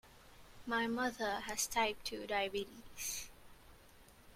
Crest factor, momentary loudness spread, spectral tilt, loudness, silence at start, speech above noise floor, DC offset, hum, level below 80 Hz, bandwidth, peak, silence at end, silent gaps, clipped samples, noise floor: 22 dB; 10 LU; -1.5 dB/octave; -38 LUFS; 0.05 s; 23 dB; under 0.1%; none; -64 dBFS; 16.5 kHz; -20 dBFS; 0 s; none; under 0.1%; -61 dBFS